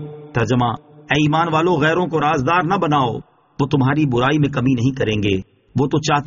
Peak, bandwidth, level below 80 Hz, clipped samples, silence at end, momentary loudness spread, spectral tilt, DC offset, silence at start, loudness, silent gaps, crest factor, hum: -4 dBFS; 7.2 kHz; -46 dBFS; under 0.1%; 0 s; 7 LU; -5 dB/octave; under 0.1%; 0 s; -18 LUFS; none; 14 dB; none